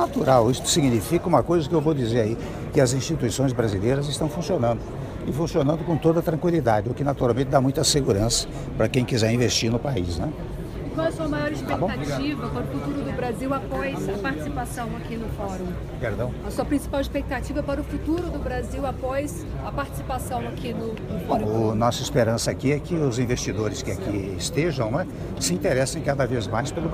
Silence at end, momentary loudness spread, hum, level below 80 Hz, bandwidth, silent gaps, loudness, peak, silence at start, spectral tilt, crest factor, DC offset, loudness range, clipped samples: 0 s; 9 LU; none; -38 dBFS; 15.5 kHz; none; -24 LUFS; -4 dBFS; 0 s; -5.5 dB/octave; 20 dB; under 0.1%; 6 LU; under 0.1%